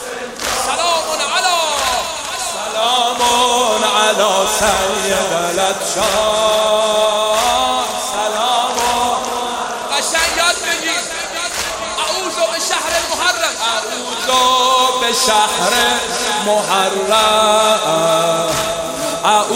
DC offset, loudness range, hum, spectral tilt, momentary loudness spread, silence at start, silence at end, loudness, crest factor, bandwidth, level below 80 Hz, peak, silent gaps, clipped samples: under 0.1%; 3 LU; none; -1 dB/octave; 7 LU; 0 s; 0 s; -15 LUFS; 14 dB; 16 kHz; -46 dBFS; -2 dBFS; none; under 0.1%